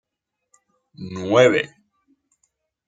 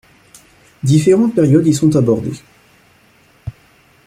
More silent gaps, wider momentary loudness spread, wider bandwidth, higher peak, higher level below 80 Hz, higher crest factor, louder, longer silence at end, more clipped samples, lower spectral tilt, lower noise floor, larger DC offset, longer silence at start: neither; about the same, 20 LU vs 22 LU; second, 9 kHz vs 15 kHz; about the same, -2 dBFS vs 0 dBFS; second, -64 dBFS vs -48 dBFS; first, 22 dB vs 14 dB; second, -18 LUFS vs -13 LUFS; first, 1.2 s vs 0.55 s; neither; second, -5 dB/octave vs -7.5 dB/octave; first, -81 dBFS vs -51 dBFS; neither; first, 1 s vs 0.85 s